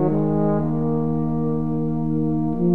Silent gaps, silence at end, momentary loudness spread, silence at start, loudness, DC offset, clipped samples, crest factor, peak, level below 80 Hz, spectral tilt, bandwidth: none; 0 s; 3 LU; 0 s; -22 LUFS; 3%; under 0.1%; 14 dB; -6 dBFS; -42 dBFS; -12.5 dB/octave; 2.5 kHz